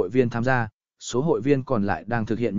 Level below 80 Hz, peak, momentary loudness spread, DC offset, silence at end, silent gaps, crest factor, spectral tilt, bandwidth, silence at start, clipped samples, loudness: -50 dBFS; -6 dBFS; 7 LU; 0.9%; 0 s; 0.73-0.80 s; 18 dB; -6.5 dB/octave; 7.6 kHz; 0 s; under 0.1%; -24 LUFS